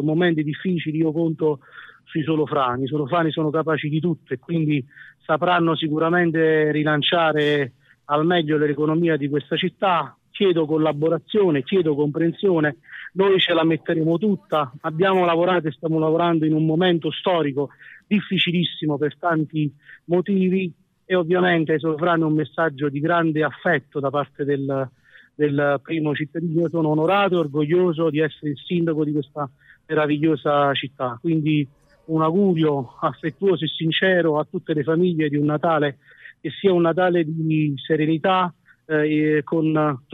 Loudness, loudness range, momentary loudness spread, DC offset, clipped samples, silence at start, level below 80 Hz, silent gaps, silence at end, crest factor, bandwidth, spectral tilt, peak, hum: -21 LUFS; 3 LU; 7 LU; under 0.1%; under 0.1%; 0 s; -68 dBFS; none; 0.15 s; 16 dB; 4.2 kHz; -9 dB/octave; -6 dBFS; none